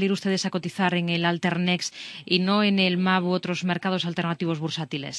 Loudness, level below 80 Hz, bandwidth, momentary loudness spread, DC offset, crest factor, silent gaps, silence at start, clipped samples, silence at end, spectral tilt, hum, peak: -24 LUFS; -70 dBFS; 11 kHz; 8 LU; under 0.1%; 18 dB; none; 0 s; under 0.1%; 0 s; -5 dB/octave; none; -6 dBFS